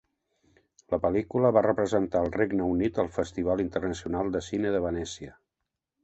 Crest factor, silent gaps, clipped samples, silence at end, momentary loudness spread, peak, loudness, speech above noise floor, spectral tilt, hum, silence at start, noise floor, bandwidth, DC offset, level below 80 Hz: 20 dB; none; under 0.1%; 0.7 s; 8 LU; -8 dBFS; -28 LUFS; 58 dB; -6.5 dB/octave; none; 0.9 s; -85 dBFS; 8.4 kHz; under 0.1%; -50 dBFS